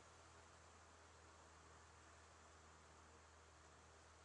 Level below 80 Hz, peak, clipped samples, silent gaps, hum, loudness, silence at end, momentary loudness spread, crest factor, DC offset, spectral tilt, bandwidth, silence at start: -78 dBFS; -52 dBFS; under 0.1%; none; none; -66 LUFS; 0 s; 1 LU; 14 dB; under 0.1%; -3 dB/octave; 10.5 kHz; 0 s